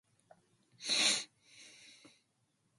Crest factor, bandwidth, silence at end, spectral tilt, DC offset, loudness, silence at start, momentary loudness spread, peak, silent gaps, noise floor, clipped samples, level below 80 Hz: 24 dB; 12 kHz; 1.1 s; 1 dB/octave; under 0.1%; -32 LUFS; 0.8 s; 26 LU; -16 dBFS; none; -78 dBFS; under 0.1%; under -90 dBFS